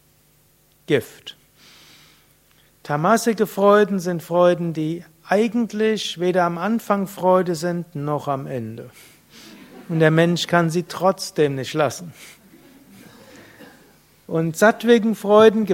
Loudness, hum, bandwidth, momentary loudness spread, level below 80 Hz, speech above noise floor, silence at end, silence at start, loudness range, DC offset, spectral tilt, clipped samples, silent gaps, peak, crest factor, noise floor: -19 LUFS; none; 16.5 kHz; 12 LU; -64 dBFS; 39 dB; 0 s; 0.9 s; 6 LU; under 0.1%; -5.5 dB/octave; under 0.1%; none; 0 dBFS; 20 dB; -58 dBFS